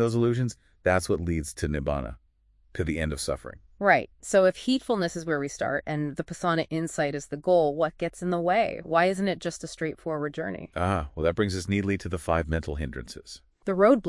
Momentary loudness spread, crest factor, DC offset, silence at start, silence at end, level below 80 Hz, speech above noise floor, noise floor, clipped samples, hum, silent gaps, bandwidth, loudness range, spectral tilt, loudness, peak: 11 LU; 22 dB; under 0.1%; 0 s; 0 s; -46 dBFS; 36 dB; -63 dBFS; under 0.1%; none; none; 12 kHz; 3 LU; -5.5 dB/octave; -27 LUFS; -6 dBFS